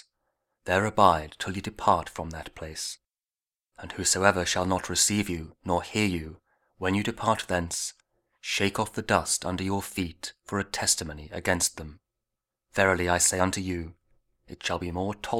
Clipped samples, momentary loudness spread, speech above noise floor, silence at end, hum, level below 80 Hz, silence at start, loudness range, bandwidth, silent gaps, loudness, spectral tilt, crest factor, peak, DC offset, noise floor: under 0.1%; 15 LU; over 63 dB; 0 s; none; -50 dBFS; 0.65 s; 3 LU; 18.5 kHz; none; -27 LUFS; -3 dB/octave; 26 dB; -4 dBFS; under 0.1%; under -90 dBFS